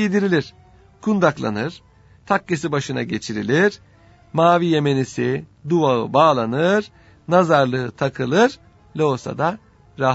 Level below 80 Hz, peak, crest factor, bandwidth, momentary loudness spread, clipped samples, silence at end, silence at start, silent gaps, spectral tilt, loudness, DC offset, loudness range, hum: -56 dBFS; 0 dBFS; 20 dB; 8 kHz; 11 LU; under 0.1%; 0 s; 0 s; none; -6 dB/octave; -19 LUFS; under 0.1%; 4 LU; none